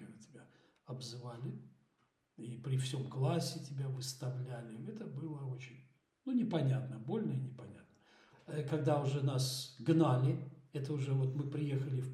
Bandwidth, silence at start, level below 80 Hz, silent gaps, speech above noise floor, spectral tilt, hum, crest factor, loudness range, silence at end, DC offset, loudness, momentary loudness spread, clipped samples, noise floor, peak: 14 kHz; 0 s; -82 dBFS; none; 42 dB; -6.5 dB/octave; none; 20 dB; 6 LU; 0 s; under 0.1%; -38 LUFS; 15 LU; under 0.1%; -79 dBFS; -18 dBFS